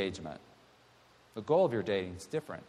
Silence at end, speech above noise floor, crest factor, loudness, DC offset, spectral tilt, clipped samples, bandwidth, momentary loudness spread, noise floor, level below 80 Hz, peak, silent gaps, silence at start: 0.05 s; 30 dB; 18 dB; -33 LUFS; under 0.1%; -6 dB/octave; under 0.1%; 13.5 kHz; 19 LU; -63 dBFS; -68 dBFS; -16 dBFS; none; 0 s